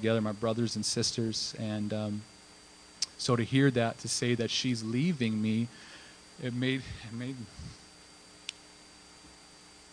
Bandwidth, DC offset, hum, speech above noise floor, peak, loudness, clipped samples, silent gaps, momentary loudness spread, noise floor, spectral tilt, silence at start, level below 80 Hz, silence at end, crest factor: 10.5 kHz; under 0.1%; none; 24 dB; -12 dBFS; -31 LUFS; under 0.1%; none; 23 LU; -55 dBFS; -4.5 dB/octave; 0 s; -62 dBFS; 0 s; 20 dB